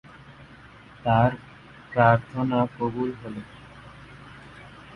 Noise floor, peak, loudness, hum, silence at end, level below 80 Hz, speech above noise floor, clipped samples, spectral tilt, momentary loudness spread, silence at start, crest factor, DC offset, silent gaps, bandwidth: -48 dBFS; -4 dBFS; -24 LUFS; none; 0 s; -52 dBFS; 25 dB; under 0.1%; -9 dB/octave; 25 LU; 0.3 s; 22 dB; under 0.1%; none; 6 kHz